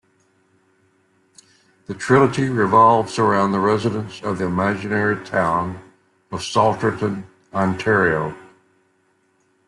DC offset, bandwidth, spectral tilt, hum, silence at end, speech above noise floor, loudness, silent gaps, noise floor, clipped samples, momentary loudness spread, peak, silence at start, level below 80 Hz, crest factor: under 0.1%; 11.5 kHz; -6 dB/octave; none; 1.25 s; 45 dB; -19 LUFS; none; -63 dBFS; under 0.1%; 15 LU; -2 dBFS; 1.9 s; -56 dBFS; 18 dB